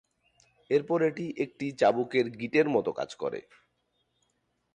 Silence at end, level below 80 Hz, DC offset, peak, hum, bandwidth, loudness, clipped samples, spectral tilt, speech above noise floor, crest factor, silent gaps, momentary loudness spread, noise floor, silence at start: 1.35 s; -72 dBFS; under 0.1%; -12 dBFS; 60 Hz at -65 dBFS; 9.6 kHz; -29 LUFS; under 0.1%; -6.5 dB/octave; 48 dB; 18 dB; none; 9 LU; -76 dBFS; 0.7 s